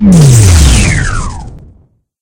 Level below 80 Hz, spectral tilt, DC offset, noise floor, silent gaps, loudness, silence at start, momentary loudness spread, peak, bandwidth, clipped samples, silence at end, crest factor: -14 dBFS; -5 dB/octave; under 0.1%; -45 dBFS; none; -6 LUFS; 0 s; 17 LU; 0 dBFS; 18.5 kHz; 5%; 0.65 s; 6 dB